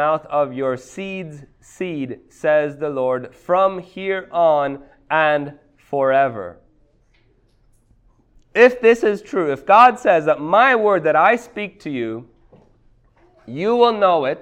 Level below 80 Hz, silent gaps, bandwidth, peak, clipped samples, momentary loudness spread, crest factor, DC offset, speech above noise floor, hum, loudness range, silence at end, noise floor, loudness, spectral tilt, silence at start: -58 dBFS; none; 9.6 kHz; 0 dBFS; under 0.1%; 16 LU; 18 dB; under 0.1%; 40 dB; none; 7 LU; 0 s; -57 dBFS; -17 LUFS; -5.5 dB/octave; 0 s